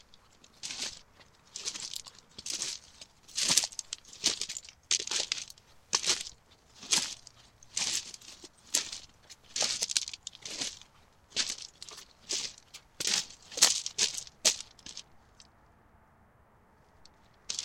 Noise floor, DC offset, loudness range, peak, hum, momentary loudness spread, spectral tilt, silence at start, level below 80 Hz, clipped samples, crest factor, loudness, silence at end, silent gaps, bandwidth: -63 dBFS; under 0.1%; 6 LU; -4 dBFS; none; 20 LU; 1.5 dB/octave; 0.15 s; -68 dBFS; under 0.1%; 32 dB; -31 LUFS; 0 s; none; 16.5 kHz